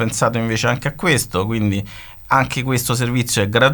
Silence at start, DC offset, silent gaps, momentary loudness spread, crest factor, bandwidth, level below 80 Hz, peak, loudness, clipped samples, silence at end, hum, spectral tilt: 0 s; under 0.1%; none; 4 LU; 18 dB; 19.5 kHz; -42 dBFS; 0 dBFS; -18 LUFS; under 0.1%; 0 s; none; -4.5 dB/octave